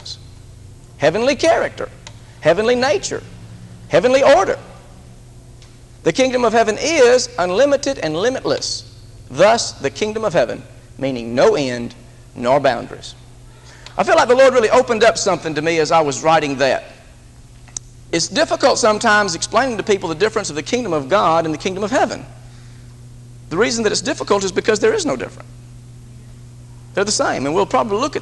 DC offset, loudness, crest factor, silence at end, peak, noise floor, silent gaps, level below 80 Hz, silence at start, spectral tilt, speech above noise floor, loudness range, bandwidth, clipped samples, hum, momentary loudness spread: under 0.1%; -16 LUFS; 18 dB; 0 s; 0 dBFS; -42 dBFS; none; -44 dBFS; 0 s; -3.5 dB/octave; 26 dB; 5 LU; 12 kHz; under 0.1%; none; 14 LU